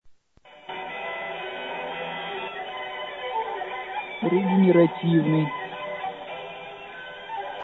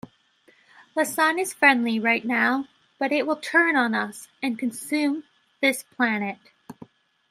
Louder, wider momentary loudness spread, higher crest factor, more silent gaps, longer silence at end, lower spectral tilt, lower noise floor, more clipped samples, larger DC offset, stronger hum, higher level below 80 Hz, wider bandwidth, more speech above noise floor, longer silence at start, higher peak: second, -26 LUFS vs -23 LUFS; first, 18 LU vs 12 LU; about the same, 20 dB vs 22 dB; neither; second, 0 s vs 0.6 s; first, -9 dB/octave vs -3.5 dB/octave; second, -53 dBFS vs -60 dBFS; neither; neither; neither; first, -68 dBFS vs -76 dBFS; second, 4.1 kHz vs 15.5 kHz; second, 33 dB vs 37 dB; second, 0.05 s vs 0.95 s; about the same, -6 dBFS vs -4 dBFS